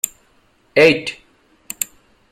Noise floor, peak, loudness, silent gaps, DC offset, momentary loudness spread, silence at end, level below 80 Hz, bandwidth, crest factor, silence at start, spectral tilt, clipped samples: -57 dBFS; 0 dBFS; -17 LUFS; none; under 0.1%; 16 LU; 0.45 s; -58 dBFS; 16.5 kHz; 20 dB; 0.05 s; -3 dB/octave; under 0.1%